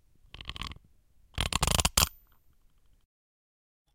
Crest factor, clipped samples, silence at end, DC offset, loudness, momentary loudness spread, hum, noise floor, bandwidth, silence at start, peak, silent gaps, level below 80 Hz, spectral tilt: 30 dB; under 0.1%; 1.85 s; under 0.1%; -28 LUFS; 19 LU; none; -64 dBFS; 17 kHz; 0.35 s; -4 dBFS; none; -42 dBFS; -2 dB/octave